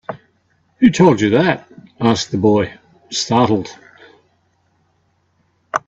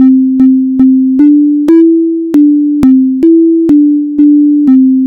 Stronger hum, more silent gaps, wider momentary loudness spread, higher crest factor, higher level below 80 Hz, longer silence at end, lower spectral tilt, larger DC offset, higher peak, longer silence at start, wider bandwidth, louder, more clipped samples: neither; neither; first, 14 LU vs 2 LU; first, 18 dB vs 6 dB; second, -54 dBFS vs -42 dBFS; about the same, 0.1 s vs 0 s; second, -5.5 dB/octave vs -9 dB/octave; neither; about the same, 0 dBFS vs 0 dBFS; about the same, 0.1 s vs 0 s; first, 8 kHz vs 2.8 kHz; second, -16 LUFS vs -6 LUFS; second, under 0.1% vs 2%